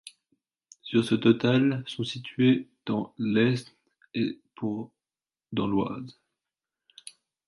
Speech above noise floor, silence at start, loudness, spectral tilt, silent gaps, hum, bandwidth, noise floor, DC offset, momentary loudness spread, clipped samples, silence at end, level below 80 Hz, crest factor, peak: over 64 dB; 0.05 s; -27 LUFS; -7 dB/octave; none; none; 11.5 kHz; under -90 dBFS; under 0.1%; 22 LU; under 0.1%; 1.35 s; -66 dBFS; 20 dB; -8 dBFS